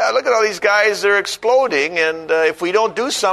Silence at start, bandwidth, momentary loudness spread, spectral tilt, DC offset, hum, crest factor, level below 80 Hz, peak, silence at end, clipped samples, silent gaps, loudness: 0 s; 13.5 kHz; 3 LU; -2 dB/octave; under 0.1%; none; 14 dB; -60 dBFS; -2 dBFS; 0 s; under 0.1%; none; -16 LUFS